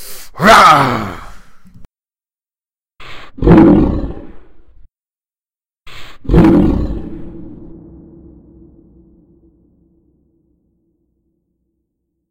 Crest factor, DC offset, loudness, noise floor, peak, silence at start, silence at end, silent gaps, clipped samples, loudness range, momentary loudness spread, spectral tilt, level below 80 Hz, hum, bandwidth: 16 dB; under 0.1%; -9 LUFS; under -90 dBFS; 0 dBFS; 0 s; 4.65 s; none; under 0.1%; 4 LU; 28 LU; -6 dB/octave; -26 dBFS; none; 16 kHz